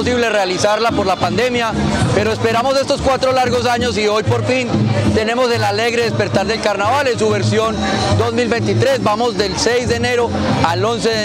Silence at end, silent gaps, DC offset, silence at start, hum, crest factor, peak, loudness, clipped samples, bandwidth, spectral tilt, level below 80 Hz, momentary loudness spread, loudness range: 0 s; none; under 0.1%; 0 s; none; 16 dB; 0 dBFS; -15 LUFS; under 0.1%; 16 kHz; -5 dB/octave; -40 dBFS; 2 LU; 0 LU